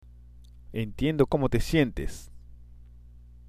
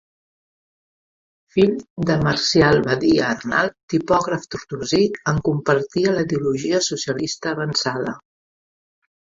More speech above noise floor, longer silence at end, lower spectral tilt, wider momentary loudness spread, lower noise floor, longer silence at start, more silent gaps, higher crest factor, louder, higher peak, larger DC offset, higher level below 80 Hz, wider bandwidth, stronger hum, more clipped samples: second, 24 dB vs over 70 dB; second, 0.05 s vs 1 s; first, -6.5 dB/octave vs -5 dB/octave; first, 14 LU vs 9 LU; second, -49 dBFS vs under -90 dBFS; second, 0.1 s vs 1.55 s; second, none vs 1.90-1.96 s, 3.83-3.88 s; about the same, 22 dB vs 18 dB; second, -27 LUFS vs -20 LUFS; second, -8 dBFS vs -2 dBFS; neither; first, -40 dBFS vs -48 dBFS; first, 15.5 kHz vs 7.8 kHz; first, 60 Hz at -45 dBFS vs none; neither